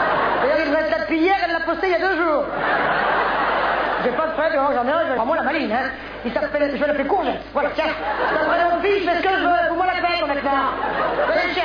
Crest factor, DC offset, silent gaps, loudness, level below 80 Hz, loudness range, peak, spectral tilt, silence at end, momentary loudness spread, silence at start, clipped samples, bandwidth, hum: 12 dB; under 0.1%; none; -20 LUFS; -46 dBFS; 2 LU; -8 dBFS; -6 dB/octave; 0 s; 4 LU; 0 s; under 0.1%; 5.4 kHz; none